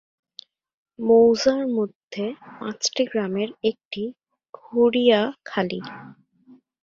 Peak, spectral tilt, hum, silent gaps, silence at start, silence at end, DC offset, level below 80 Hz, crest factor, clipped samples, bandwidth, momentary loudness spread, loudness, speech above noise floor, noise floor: -4 dBFS; -4.5 dB/octave; none; 1.95-2.08 s, 3.85-3.91 s, 4.49-4.53 s; 1 s; 0.7 s; under 0.1%; -66 dBFS; 18 dB; under 0.1%; 7.6 kHz; 16 LU; -22 LUFS; 32 dB; -54 dBFS